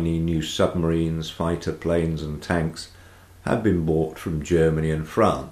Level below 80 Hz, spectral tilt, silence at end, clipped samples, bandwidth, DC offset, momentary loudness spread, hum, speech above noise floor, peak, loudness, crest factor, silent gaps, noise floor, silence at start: -40 dBFS; -6.5 dB/octave; 0 s; under 0.1%; 14.5 kHz; under 0.1%; 9 LU; none; 25 dB; -6 dBFS; -24 LUFS; 16 dB; none; -48 dBFS; 0 s